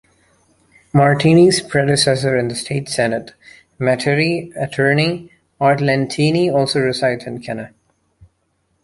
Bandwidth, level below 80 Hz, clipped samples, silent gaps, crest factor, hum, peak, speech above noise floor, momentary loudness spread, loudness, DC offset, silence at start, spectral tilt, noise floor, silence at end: 11.5 kHz; -52 dBFS; under 0.1%; none; 16 dB; none; -2 dBFS; 50 dB; 14 LU; -16 LUFS; under 0.1%; 0.95 s; -5.5 dB/octave; -66 dBFS; 1.15 s